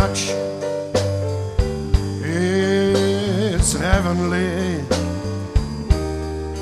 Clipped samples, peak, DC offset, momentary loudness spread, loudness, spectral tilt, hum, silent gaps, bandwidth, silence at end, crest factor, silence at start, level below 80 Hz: under 0.1%; -2 dBFS; under 0.1%; 7 LU; -21 LUFS; -5 dB/octave; none; none; 13.5 kHz; 0 s; 18 dB; 0 s; -26 dBFS